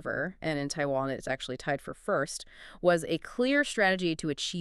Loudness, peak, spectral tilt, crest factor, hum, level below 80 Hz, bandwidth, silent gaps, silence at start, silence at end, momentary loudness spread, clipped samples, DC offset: -30 LUFS; -10 dBFS; -4.5 dB/octave; 20 dB; none; -58 dBFS; 13 kHz; none; 0 s; 0 s; 8 LU; under 0.1%; under 0.1%